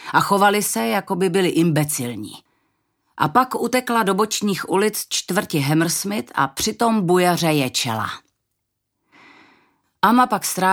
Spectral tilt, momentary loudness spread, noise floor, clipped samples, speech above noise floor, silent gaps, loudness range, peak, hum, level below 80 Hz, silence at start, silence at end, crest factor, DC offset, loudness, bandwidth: -4 dB/octave; 8 LU; -76 dBFS; under 0.1%; 57 dB; none; 2 LU; 0 dBFS; none; -60 dBFS; 0 s; 0 s; 20 dB; under 0.1%; -19 LUFS; 19.5 kHz